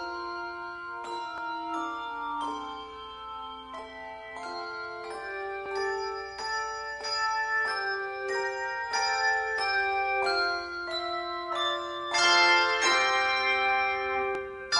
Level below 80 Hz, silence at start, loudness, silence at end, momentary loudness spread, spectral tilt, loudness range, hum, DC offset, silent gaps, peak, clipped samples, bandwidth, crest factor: -62 dBFS; 0 s; -28 LUFS; 0 s; 16 LU; -0.5 dB/octave; 12 LU; none; under 0.1%; none; -10 dBFS; under 0.1%; 10.5 kHz; 20 dB